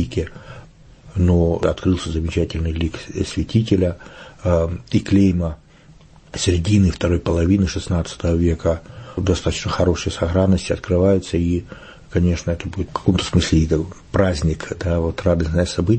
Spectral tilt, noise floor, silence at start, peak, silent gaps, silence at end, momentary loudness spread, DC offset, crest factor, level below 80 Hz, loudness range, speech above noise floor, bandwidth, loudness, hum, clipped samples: -6.5 dB/octave; -47 dBFS; 0 s; -2 dBFS; none; 0 s; 10 LU; under 0.1%; 16 dB; -32 dBFS; 2 LU; 28 dB; 8.8 kHz; -20 LUFS; none; under 0.1%